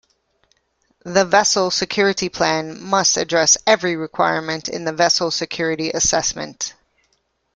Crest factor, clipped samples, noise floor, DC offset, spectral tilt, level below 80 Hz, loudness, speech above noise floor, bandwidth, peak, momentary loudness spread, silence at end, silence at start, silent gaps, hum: 18 dB; under 0.1%; -67 dBFS; under 0.1%; -2 dB/octave; -52 dBFS; -18 LUFS; 48 dB; 11 kHz; -2 dBFS; 10 LU; 0.85 s; 1.05 s; none; none